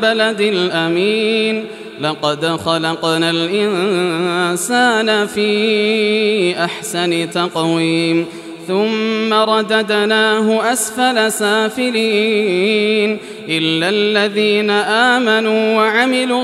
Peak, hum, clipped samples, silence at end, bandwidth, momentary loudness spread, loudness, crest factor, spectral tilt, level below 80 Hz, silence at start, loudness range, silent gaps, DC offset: 0 dBFS; none; under 0.1%; 0 s; 14 kHz; 5 LU; -15 LUFS; 14 dB; -3.5 dB/octave; -64 dBFS; 0 s; 2 LU; none; under 0.1%